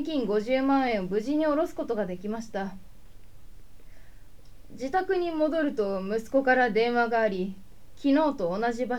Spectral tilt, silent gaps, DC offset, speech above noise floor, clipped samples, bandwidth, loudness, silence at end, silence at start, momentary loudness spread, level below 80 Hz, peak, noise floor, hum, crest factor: -6 dB/octave; none; 0.8%; 24 dB; under 0.1%; 14.5 kHz; -27 LUFS; 0 s; 0 s; 10 LU; -52 dBFS; -10 dBFS; -50 dBFS; none; 18 dB